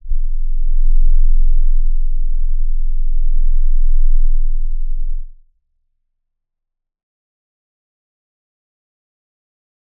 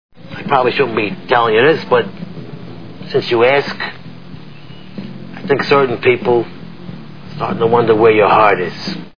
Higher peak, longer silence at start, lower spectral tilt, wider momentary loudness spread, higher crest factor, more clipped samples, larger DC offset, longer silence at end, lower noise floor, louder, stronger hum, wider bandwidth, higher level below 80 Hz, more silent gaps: about the same, -2 dBFS vs 0 dBFS; about the same, 0.05 s vs 0.1 s; first, -15 dB/octave vs -7 dB/octave; second, 8 LU vs 22 LU; second, 10 dB vs 16 dB; neither; second, under 0.1% vs 2%; first, 4.7 s vs 0 s; first, -77 dBFS vs -35 dBFS; second, -23 LUFS vs -14 LUFS; neither; second, 0.1 kHz vs 5.4 kHz; first, -14 dBFS vs -52 dBFS; neither